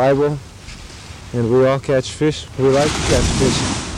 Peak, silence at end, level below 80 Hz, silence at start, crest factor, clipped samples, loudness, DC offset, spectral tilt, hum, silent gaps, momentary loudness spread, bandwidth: -4 dBFS; 0 s; -32 dBFS; 0 s; 14 dB; under 0.1%; -17 LUFS; under 0.1%; -5 dB/octave; none; none; 20 LU; 15 kHz